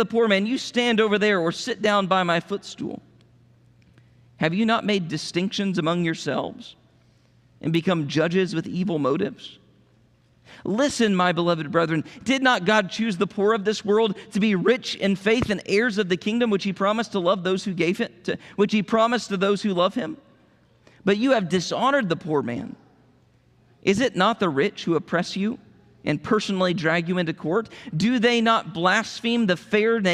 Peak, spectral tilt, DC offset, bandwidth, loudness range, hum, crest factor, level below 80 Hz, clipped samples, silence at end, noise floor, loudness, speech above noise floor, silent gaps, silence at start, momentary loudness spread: -6 dBFS; -5.5 dB/octave; under 0.1%; 12 kHz; 4 LU; none; 18 dB; -62 dBFS; under 0.1%; 0 s; -59 dBFS; -23 LUFS; 37 dB; none; 0 s; 9 LU